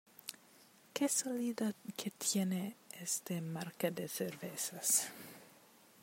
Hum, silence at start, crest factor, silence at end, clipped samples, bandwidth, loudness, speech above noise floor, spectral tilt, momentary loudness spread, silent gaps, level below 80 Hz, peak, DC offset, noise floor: none; 0.25 s; 22 dB; 0.45 s; under 0.1%; 16 kHz; -38 LUFS; 26 dB; -3.5 dB/octave; 17 LU; none; -88 dBFS; -18 dBFS; under 0.1%; -64 dBFS